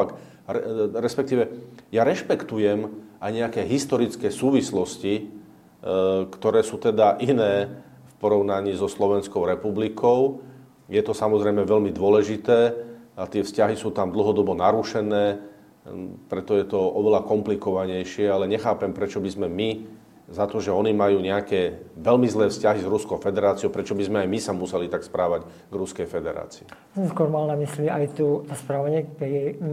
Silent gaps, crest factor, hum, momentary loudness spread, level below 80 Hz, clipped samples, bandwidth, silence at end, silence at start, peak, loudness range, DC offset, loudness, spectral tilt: none; 18 dB; none; 11 LU; -62 dBFS; under 0.1%; 14 kHz; 0 s; 0 s; -4 dBFS; 4 LU; under 0.1%; -23 LUFS; -6 dB/octave